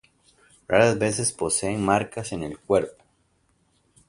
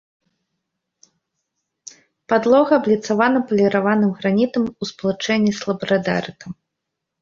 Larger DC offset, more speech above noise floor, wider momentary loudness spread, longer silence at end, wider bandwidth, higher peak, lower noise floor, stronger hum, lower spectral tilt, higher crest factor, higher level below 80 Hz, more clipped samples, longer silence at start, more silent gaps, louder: neither; second, 43 dB vs 62 dB; about the same, 12 LU vs 10 LU; first, 1.2 s vs 0.7 s; first, 11.5 kHz vs 7.4 kHz; about the same, -4 dBFS vs -2 dBFS; second, -67 dBFS vs -80 dBFS; neither; second, -4 dB/octave vs -6 dB/octave; about the same, 22 dB vs 18 dB; first, -54 dBFS vs -60 dBFS; neither; second, 0.7 s vs 2.3 s; neither; second, -23 LUFS vs -18 LUFS